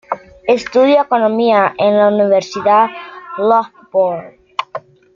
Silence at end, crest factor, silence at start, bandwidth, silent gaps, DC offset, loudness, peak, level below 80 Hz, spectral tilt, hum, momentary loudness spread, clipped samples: 0.35 s; 12 dB; 0.1 s; 7.4 kHz; none; under 0.1%; -14 LUFS; -2 dBFS; -58 dBFS; -5.5 dB/octave; none; 15 LU; under 0.1%